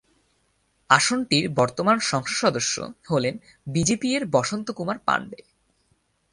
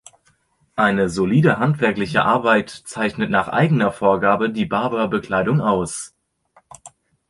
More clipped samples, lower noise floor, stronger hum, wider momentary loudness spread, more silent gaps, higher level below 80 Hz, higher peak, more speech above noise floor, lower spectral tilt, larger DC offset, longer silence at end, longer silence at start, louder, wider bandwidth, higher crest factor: neither; first, -68 dBFS vs -62 dBFS; neither; about the same, 10 LU vs 8 LU; neither; second, -58 dBFS vs -50 dBFS; about the same, 0 dBFS vs -2 dBFS; about the same, 44 dB vs 43 dB; second, -3.5 dB/octave vs -6 dB/octave; neither; first, 1 s vs 0.4 s; first, 0.9 s vs 0.75 s; second, -23 LUFS vs -18 LUFS; about the same, 11.5 kHz vs 11.5 kHz; first, 24 dB vs 18 dB